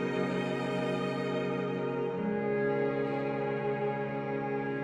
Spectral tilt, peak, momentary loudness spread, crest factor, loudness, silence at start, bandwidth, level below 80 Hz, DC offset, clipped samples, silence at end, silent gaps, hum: -7.5 dB/octave; -20 dBFS; 3 LU; 12 dB; -32 LUFS; 0 s; 10.5 kHz; -68 dBFS; under 0.1%; under 0.1%; 0 s; none; none